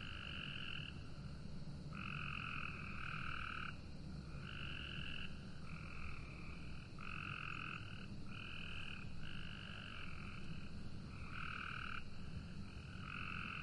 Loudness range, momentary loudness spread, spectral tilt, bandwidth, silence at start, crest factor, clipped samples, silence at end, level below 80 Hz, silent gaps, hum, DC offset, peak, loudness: 3 LU; 7 LU; -5.5 dB/octave; 11 kHz; 0 s; 16 dB; under 0.1%; 0 s; -56 dBFS; none; none; under 0.1%; -32 dBFS; -49 LUFS